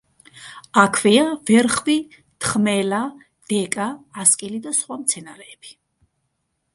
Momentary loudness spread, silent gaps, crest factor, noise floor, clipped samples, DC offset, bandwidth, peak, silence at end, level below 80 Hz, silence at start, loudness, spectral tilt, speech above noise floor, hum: 22 LU; none; 20 dB; -73 dBFS; under 0.1%; under 0.1%; 11.5 kHz; 0 dBFS; 1 s; -60 dBFS; 0.4 s; -19 LUFS; -3 dB/octave; 53 dB; none